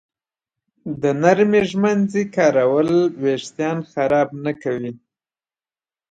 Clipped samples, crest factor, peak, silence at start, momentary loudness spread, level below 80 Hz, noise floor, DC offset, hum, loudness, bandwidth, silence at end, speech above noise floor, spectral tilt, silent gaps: under 0.1%; 18 dB; -2 dBFS; 0.85 s; 10 LU; -60 dBFS; under -90 dBFS; under 0.1%; none; -19 LUFS; 9 kHz; 1.15 s; over 72 dB; -6.5 dB/octave; none